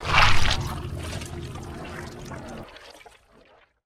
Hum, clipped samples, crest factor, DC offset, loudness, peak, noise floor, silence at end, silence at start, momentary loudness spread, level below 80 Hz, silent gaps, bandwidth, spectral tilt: none; under 0.1%; 20 dB; under 0.1%; -27 LUFS; -4 dBFS; -57 dBFS; 0.95 s; 0 s; 22 LU; -34 dBFS; none; 13.5 kHz; -3.5 dB/octave